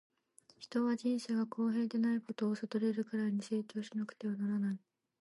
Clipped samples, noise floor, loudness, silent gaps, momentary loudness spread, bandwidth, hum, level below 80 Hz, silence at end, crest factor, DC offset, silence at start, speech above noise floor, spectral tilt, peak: under 0.1%; -67 dBFS; -37 LUFS; none; 6 LU; 11.5 kHz; none; -88 dBFS; 0.45 s; 12 dB; under 0.1%; 0.6 s; 32 dB; -6.5 dB/octave; -24 dBFS